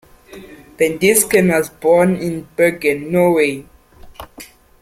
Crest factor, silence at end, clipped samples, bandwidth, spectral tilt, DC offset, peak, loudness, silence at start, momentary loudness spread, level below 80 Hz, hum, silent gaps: 16 dB; 0.35 s; under 0.1%; 16.5 kHz; -4.5 dB/octave; under 0.1%; 0 dBFS; -15 LUFS; 0.3 s; 11 LU; -48 dBFS; none; none